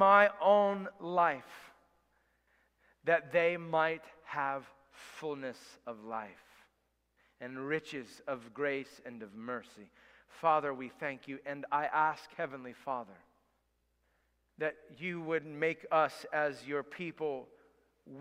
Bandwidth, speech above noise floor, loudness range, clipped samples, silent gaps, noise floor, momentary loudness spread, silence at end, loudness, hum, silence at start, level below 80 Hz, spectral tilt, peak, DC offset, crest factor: 13.5 kHz; 44 dB; 8 LU; under 0.1%; none; -78 dBFS; 17 LU; 0 s; -34 LUFS; none; 0 s; -78 dBFS; -5.5 dB/octave; -10 dBFS; under 0.1%; 24 dB